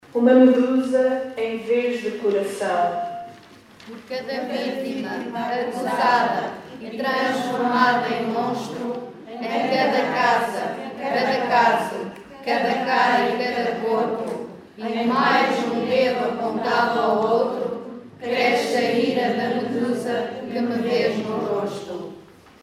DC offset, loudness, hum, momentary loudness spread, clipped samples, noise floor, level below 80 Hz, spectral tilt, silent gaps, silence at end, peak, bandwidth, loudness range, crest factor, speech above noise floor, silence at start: under 0.1%; -22 LUFS; none; 14 LU; under 0.1%; -47 dBFS; -68 dBFS; -5 dB/octave; none; 0.4 s; -4 dBFS; 14 kHz; 4 LU; 18 dB; 26 dB; 0.15 s